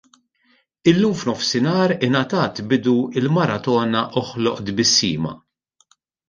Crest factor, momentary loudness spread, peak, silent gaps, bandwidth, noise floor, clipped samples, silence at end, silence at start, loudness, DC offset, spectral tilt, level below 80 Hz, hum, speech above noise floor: 18 dB; 7 LU; -2 dBFS; none; 10 kHz; -62 dBFS; under 0.1%; 0.9 s; 0.85 s; -19 LUFS; under 0.1%; -4.5 dB/octave; -56 dBFS; none; 43 dB